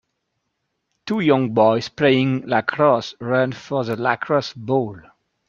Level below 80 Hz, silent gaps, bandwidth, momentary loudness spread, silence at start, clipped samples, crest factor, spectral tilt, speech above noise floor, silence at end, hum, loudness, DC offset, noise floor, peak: -62 dBFS; none; 7.4 kHz; 7 LU; 1.05 s; under 0.1%; 18 dB; -7 dB/octave; 56 dB; 0.5 s; none; -19 LUFS; under 0.1%; -75 dBFS; -2 dBFS